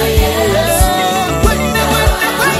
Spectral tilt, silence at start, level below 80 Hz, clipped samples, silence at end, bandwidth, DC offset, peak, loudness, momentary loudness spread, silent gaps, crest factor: -4 dB/octave; 0 s; -18 dBFS; under 0.1%; 0 s; 16 kHz; under 0.1%; 0 dBFS; -12 LUFS; 2 LU; none; 12 dB